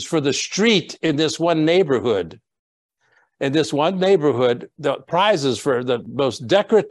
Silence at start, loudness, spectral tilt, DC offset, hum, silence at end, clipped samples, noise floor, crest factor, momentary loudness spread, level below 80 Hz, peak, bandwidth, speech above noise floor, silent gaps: 0 s; -19 LUFS; -4.5 dB/octave; under 0.1%; none; 0 s; under 0.1%; -62 dBFS; 16 dB; 7 LU; -64 dBFS; -2 dBFS; 12 kHz; 43 dB; 2.59-2.89 s